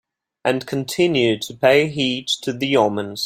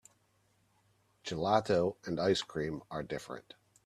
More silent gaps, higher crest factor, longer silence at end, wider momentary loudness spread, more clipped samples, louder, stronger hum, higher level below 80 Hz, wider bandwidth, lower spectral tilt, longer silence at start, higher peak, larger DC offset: neither; second, 18 dB vs 24 dB; second, 0 s vs 0.45 s; second, 7 LU vs 15 LU; neither; first, -19 LUFS vs -34 LUFS; neither; first, -60 dBFS vs -66 dBFS; first, 16.5 kHz vs 13.5 kHz; about the same, -4.5 dB/octave vs -5.5 dB/octave; second, 0.45 s vs 1.25 s; first, -2 dBFS vs -12 dBFS; neither